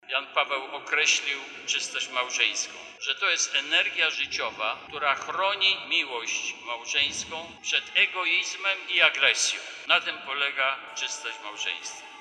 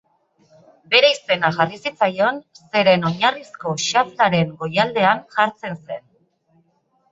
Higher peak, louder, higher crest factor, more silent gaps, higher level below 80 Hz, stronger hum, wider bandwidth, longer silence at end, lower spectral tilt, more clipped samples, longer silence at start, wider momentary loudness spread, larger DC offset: second, -6 dBFS vs -2 dBFS; second, -25 LUFS vs -18 LUFS; about the same, 22 dB vs 18 dB; neither; second, -72 dBFS vs -64 dBFS; neither; first, 12.5 kHz vs 8 kHz; second, 0 s vs 1.15 s; second, 1.5 dB/octave vs -4 dB/octave; neither; second, 0.05 s vs 0.9 s; second, 11 LU vs 14 LU; neither